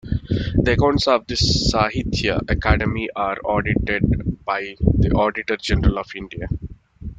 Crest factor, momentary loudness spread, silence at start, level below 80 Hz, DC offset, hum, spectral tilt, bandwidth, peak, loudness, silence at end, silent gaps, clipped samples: 18 dB; 11 LU; 0.05 s; -28 dBFS; under 0.1%; none; -5.5 dB/octave; 9.2 kHz; -2 dBFS; -20 LUFS; 0.05 s; none; under 0.1%